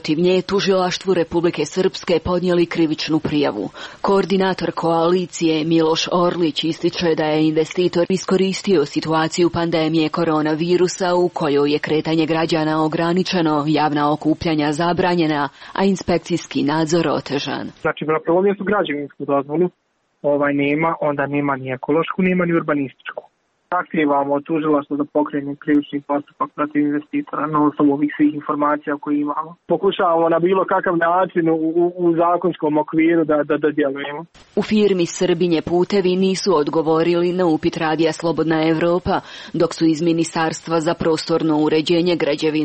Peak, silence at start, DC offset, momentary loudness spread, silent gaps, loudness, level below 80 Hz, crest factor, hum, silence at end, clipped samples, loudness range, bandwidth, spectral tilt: -6 dBFS; 0.05 s; under 0.1%; 6 LU; none; -18 LUFS; -52 dBFS; 12 dB; none; 0 s; under 0.1%; 3 LU; 8.4 kHz; -6 dB/octave